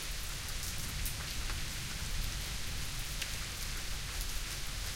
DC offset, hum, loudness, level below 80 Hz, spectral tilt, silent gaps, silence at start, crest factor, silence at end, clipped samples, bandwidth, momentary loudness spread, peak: under 0.1%; none; -39 LUFS; -42 dBFS; -2 dB/octave; none; 0 s; 18 dB; 0 s; under 0.1%; 17 kHz; 2 LU; -20 dBFS